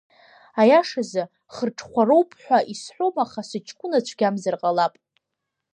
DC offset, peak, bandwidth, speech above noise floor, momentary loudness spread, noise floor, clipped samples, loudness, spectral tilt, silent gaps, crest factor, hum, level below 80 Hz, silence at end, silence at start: under 0.1%; -4 dBFS; 10 kHz; 60 dB; 15 LU; -82 dBFS; under 0.1%; -22 LUFS; -5 dB/octave; none; 18 dB; none; -72 dBFS; 0.85 s; 0.55 s